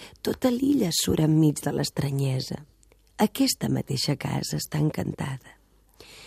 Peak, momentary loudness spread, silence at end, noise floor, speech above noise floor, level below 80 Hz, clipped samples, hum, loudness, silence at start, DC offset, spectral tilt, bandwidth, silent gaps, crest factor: -8 dBFS; 10 LU; 0 s; -54 dBFS; 29 dB; -52 dBFS; under 0.1%; none; -26 LUFS; 0 s; under 0.1%; -5 dB/octave; 15.5 kHz; none; 18 dB